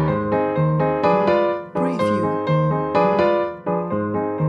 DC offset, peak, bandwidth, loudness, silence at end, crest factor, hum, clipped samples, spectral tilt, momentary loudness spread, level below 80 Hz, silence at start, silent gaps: under 0.1%; -4 dBFS; 9.4 kHz; -20 LUFS; 0 s; 14 dB; none; under 0.1%; -8.5 dB/octave; 6 LU; -48 dBFS; 0 s; none